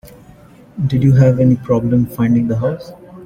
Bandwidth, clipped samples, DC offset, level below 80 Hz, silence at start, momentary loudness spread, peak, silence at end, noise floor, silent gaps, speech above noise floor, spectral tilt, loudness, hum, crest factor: 15.5 kHz; under 0.1%; under 0.1%; -42 dBFS; 0.05 s; 15 LU; -2 dBFS; 0 s; -42 dBFS; none; 29 dB; -9.5 dB/octave; -14 LUFS; none; 14 dB